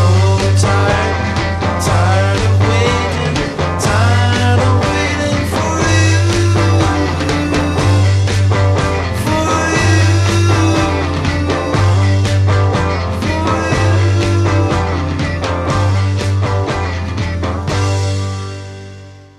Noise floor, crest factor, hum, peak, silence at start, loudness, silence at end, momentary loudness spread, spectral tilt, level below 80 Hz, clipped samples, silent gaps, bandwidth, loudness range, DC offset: -34 dBFS; 12 dB; none; 0 dBFS; 0 s; -14 LUFS; 0.15 s; 6 LU; -5.5 dB/octave; -30 dBFS; under 0.1%; none; 12 kHz; 4 LU; under 0.1%